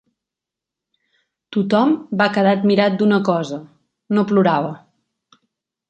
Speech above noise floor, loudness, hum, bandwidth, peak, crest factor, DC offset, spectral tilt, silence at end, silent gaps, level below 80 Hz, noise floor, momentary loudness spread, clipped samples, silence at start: 69 dB; -17 LUFS; none; 7.8 kHz; -2 dBFS; 18 dB; under 0.1%; -7.5 dB/octave; 1.1 s; none; -66 dBFS; -86 dBFS; 12 LU; under 0.1%; 1.5 s